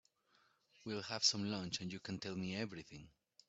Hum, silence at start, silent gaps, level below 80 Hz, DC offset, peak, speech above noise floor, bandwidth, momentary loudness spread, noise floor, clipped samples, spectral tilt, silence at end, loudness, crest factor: none; 0.8 s; none; -76 dBFS; under 0.1%; -20 dBFS; 34 dB; 8.2 kHz; 19 LU; -76 dBFS; under 0.1%; -3 dB/octave; 0.4 s; -40 LUFS; 24 dB